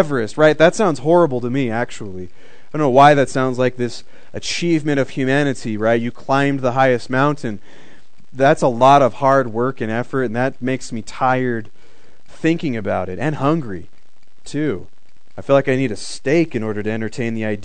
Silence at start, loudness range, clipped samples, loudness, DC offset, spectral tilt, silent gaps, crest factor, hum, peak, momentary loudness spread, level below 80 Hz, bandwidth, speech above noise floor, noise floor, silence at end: 0 s; 5 LU; under 0.1%; -17 LUFS; 4%; -6 dB/octave; none; 18 dB; none; 0 dBFS; 15 LU; -52 dBFS; 9.4 kHz; 41 dB; -58 dBFS; 0 s